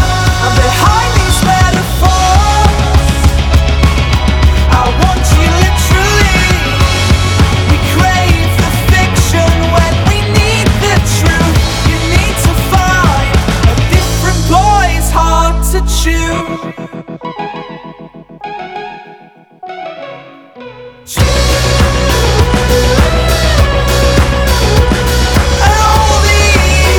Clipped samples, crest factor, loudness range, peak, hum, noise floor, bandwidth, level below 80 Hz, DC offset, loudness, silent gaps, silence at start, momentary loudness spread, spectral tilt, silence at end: 0.2%; 10 dB; 10 LU; 0 dBFS; none; -38 dBFS; 19 kHz; -14 dBFS; under 0.1%; -10 LUFS; none; 0 s; 14 LU; -4.5 dB/octave; 0 s